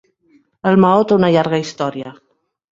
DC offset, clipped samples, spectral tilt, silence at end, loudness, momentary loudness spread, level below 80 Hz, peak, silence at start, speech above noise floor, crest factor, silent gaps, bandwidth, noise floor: under 0.1%; under 0.1%; -7 dB/octave; 0.6 s; -15 LUFS; 14 LU; -58 dBFS; -2 dBFS; 0.65 s; 42 dB; 14 dB; none; 7.6 kHz; -56 dBFS